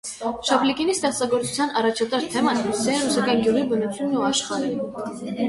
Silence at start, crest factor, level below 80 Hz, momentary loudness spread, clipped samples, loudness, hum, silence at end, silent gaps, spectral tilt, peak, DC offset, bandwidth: 0.05 s; 18 dB; -58 dBFS; 7 LU; under 0.1%; -22 LUFS; none; 0 s; none; -3.5 dB/octave; -6 dBFS; under 0.1%; 11.5 kHz